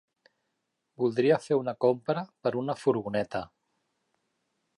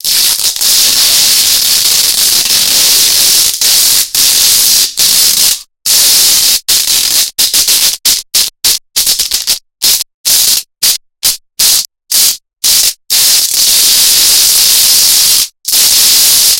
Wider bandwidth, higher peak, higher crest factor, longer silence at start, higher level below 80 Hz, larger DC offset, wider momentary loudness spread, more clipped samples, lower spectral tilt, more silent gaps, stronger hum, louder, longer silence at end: second, 11.5 kHz vs over 20 kHz; second, -10 dBFS vs 0 dBFS; first, 20 dB vs 8 dB; first, 1 s vs 0.05 s; second, -70 dBFS vs -44 dBFS; second, under 0.1% vs 0.9%; about the same, 8 LU vs 6 LU; second, under 0.1% vs 1%; first, -7 dB/octave vs 2.5 dB/octave; second, none vs 10.14-10.24 s; neither; second, -29 LUFS vs -5 LUFS; first, 1.3 s vs 0 s